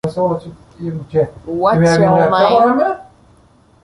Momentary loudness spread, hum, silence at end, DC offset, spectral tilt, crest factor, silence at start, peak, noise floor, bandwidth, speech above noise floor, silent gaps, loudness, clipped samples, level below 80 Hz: 15 LU; none; 0.8 s; under 0.1%; -7 dB/octave; 14 dB; 0.05 s; 0 dBFS; -49 dBFS; 11.5 kHz; 36 dB; none; -14 LUFS; under 0.1%; -46 dBFS